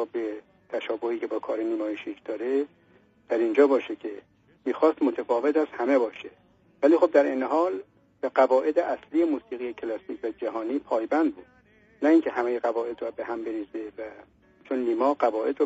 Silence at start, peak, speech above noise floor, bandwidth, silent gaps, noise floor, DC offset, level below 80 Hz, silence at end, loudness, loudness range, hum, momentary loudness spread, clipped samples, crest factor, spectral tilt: 0 s; -6 dBFS; 32 dB; 7.6 kHz; none; -57 dBFS; under 0.1%; -72 dBFS; 0 s; -26 LUFS; 5 LU; none; 14 LU; under 0.1%; 20 dB; -3 dB/octave